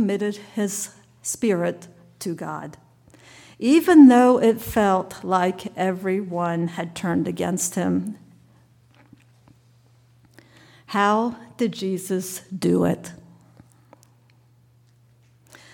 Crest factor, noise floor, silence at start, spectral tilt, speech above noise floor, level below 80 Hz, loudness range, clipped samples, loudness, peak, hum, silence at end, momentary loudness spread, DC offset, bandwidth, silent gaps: 20 dB; -57 dBFS; 0 s; -5.5 dB/octave; 36 dB; -58 dBFS; 11 LU; under 0.1%; -21 LUFS; -2 dBFS; none; 2.6 s; 17 LU; under 0.1%; 19 kHz; none